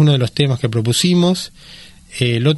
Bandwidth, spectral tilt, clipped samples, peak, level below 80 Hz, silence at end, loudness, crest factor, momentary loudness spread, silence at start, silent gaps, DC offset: 12 kHz; -5.5 dB/octave; under 0.1%; -2 dBFS; -48 dBFS; 0 s; -16 LUFS; 14 dB; 10 LU; 0 s; none; under 0.1%